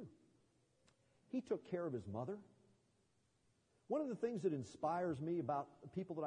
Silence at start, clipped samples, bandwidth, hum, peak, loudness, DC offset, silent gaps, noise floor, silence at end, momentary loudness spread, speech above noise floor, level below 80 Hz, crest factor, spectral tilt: 0 s; under 0.1%; 10 kHz; none; -26 dBFS; -44 LUFS; under 0.1%; none; -79 dBFS; 0 s; 8 LU; 37 dB; -84 dBFS; 18 dB; -8 dB/octave